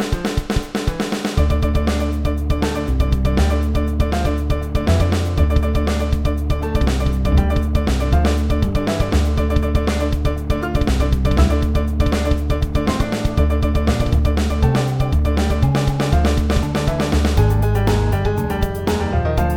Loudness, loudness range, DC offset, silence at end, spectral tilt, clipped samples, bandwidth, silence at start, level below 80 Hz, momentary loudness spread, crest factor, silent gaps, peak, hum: -19 LUFS; 2 LU; under 0.1%; 0 s; -6.5 dB/octave; under 0.1%; 16.5 kHz; 0 s; -20 dBFS; 4 LU; 14 dB; none; -2 dBFS; none